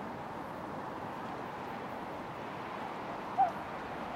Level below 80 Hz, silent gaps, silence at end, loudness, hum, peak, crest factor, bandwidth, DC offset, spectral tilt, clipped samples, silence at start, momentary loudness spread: -66 dBFS; none; 0 s; -39 LUFS; none; -18 dBFS; 20 dB; 16 kHz; under 0.1%; -6 dB/octave; under 0.1%; 0 s; 10 LU